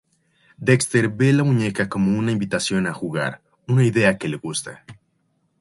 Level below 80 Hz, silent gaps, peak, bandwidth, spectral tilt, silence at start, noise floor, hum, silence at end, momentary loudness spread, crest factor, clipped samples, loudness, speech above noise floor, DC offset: -56 dBFS; none; -2 dBFS; 11.5 kHz; -5.5 dB/octave; 0.6 s; -68 dBFS; none; 0.65 s; 10 LU; 18 dB; under 0.1%; -20 LUFS; 48 dB; under 0.1%